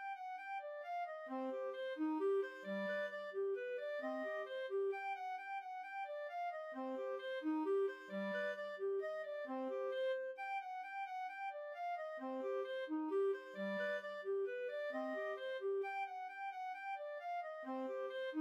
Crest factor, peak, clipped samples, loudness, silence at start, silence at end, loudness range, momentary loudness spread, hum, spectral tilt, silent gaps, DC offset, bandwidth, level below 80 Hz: 10 dB; -32 dBFS; under 0.1%; -43 LUFS; 0 s; 0 s; 2 LU; 7 LU; none; -6 dB/octave; none; under 0.1%; 8.4 kHz; under -90 dBFS